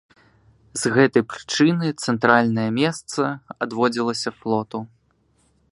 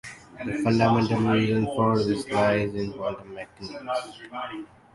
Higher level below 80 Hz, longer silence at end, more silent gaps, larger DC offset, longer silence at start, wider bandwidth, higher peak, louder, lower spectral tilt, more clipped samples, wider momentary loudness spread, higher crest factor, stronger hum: second, -62 dBFS vs -54 dBFS; first, 0.85 s vs 0.3 s; neither; neither; first, 0.75 s vs 0.05 s; about the same, 11.5 kHz vs 11.5 kHz; first, 0 dBFS vs -6 dBFS; first, -21 LUFS vs -25 LUFS; second, -5 dB/octave vs -7 dB/octave; neither; second, 12 LU vs 16 LU; about the same, 22 dB vs 18 dB; neither